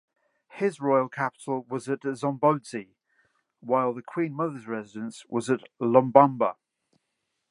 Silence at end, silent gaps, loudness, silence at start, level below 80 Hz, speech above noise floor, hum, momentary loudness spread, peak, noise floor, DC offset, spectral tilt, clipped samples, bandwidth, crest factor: 0.95 s; none; -26 LUFS; 0.55 s; -78 dBFS; 54 dB; none; 16 LU; -2 dBFS; -80 dBFS; under 0.1%; -7 dB/octave; under 0.1%; 11.5 kHz; 26 dB